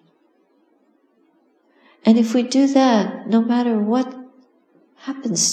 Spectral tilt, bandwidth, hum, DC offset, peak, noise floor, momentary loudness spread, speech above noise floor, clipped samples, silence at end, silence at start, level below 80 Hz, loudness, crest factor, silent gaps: -4 dB/octave; 13.5 kHz; none; under 0.1%; -2 dBFS; -61 dBFS; 14 LU; 43 dB; under 0.1%; 0 s; 2.05 s; -84 dBFS; -18 LUFS; 18 dB; none